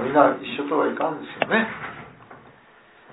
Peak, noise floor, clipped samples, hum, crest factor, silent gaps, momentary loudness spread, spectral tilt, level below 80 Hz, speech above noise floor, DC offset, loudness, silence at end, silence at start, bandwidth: -2 dBFS; -52 dBFS; under 0.1%; none; 22 dB; none; 18 LU; -9 dB/octave; -64 dBFS; 30 dB; under 0.1%; -23 LUFS; 0.65 s; 0 s; 4.1 kHz